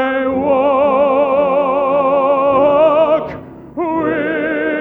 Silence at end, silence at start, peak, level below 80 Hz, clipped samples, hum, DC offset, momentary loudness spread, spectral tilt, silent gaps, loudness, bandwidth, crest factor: 0 s; 0 s; -2 dBFS; -48 dBFS; under 0.1%; none; under 0.1%; 8 LU; -8 dB/octave; none; -14 LUFS; 4 kHz; 12 dB